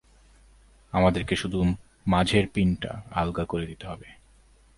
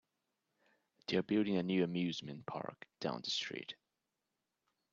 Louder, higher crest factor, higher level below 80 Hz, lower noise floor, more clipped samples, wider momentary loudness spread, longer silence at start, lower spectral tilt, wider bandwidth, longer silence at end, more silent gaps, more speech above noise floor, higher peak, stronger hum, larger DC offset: first, -26 LUFS vs -38 LUFS; about the same, 22 dB vs 20 dB; first, -42 dBFS vs -80 dBFS; second, -57 dBFS vs -88 dBFS; neither; about the same, 12 LU vs 14 LU; second, 0.95 s vs 1.1 s; about the same, -6.5 dB/octave vs -5.5 dB/octave; first, 11.5 kHz vs 7.6 kHz; second, 0.65 s vs 1.2 s; neither; second, 32 dB vs 51 dB; first, -6 dBFS vs -22 dBFS; neither; neither